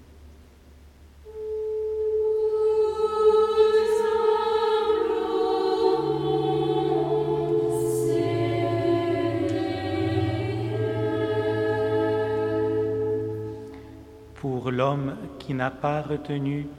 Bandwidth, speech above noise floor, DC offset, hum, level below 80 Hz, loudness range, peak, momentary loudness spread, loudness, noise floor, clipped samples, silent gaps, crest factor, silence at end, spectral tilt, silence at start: 13.5 kHz; 22 dB; under 0.1%; none; -52 dBFS; 6 LU; -8 dBFS; 9 LU; -25 LUFS; -50 dBFS; under 0.1%; none; 16 dB; 0 s; -7 dB/octave; 0 s